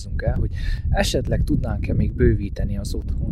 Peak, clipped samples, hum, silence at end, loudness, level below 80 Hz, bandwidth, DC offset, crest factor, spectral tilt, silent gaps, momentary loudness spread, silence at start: -6 dBFS; under 0.1%; none; 0 s; -23 LUFS; -24 dBFS; 14 kHz; under 0.1%; 16 dB; -6.5 dB/octave; none; 7 LU; 0 s